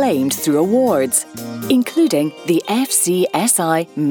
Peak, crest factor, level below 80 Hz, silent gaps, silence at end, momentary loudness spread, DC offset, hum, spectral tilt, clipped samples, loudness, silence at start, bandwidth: -2 dBFS; 16 dB; -62 dBFS; none; 0 s; 4 LU; under 0.1%; none; -4 dB/octave; under 0.1%; -16 LUFS; 0 s; 19.5 kHz